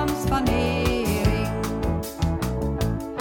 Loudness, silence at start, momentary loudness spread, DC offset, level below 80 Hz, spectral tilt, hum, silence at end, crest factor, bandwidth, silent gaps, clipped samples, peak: -24 LUFS; 0 s; 4 LU; under 0.1%; -30 dBFS; -6 dB/octave; none; 0 s; 16 dB; 17.5 kHz; none; under 0.1%; -8 dBFS